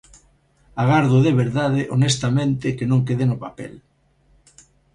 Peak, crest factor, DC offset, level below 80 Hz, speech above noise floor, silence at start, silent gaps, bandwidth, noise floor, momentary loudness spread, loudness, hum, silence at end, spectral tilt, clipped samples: -4 dBFS; 18 dB; under 0.1%; -50 dBFS; 40 dB; 0.75 s; none; 10.5 kHz; -59 dBFS; 17 LU; -19 LUFS; none; 1.15 s; -6.5 dB/octave; under 0.1%